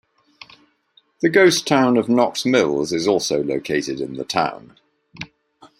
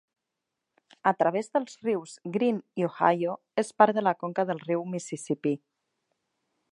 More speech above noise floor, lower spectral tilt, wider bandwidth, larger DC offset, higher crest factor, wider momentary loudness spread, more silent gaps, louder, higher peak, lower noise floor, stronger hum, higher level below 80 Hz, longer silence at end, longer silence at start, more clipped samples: second, 41 dB vs 58 dB; second, -4 dB/octave vs -6 dB/octave; first, 16 kHz vs 11.5 kHz; neither; second, 18 dB vs 24 dB; first, 22 LU vs 10 LU; neither; first, -18 LUFS vs -28 LUFS; about the same, -2 dBFS vs -4 dBFS; second, -59 dBFS vs -85 dBFS; neither; first, -62 dBFS vs -80 dBFS; second, 0.15 s vs 1.15 s; first, 1.2 s vs 1.05 s; neither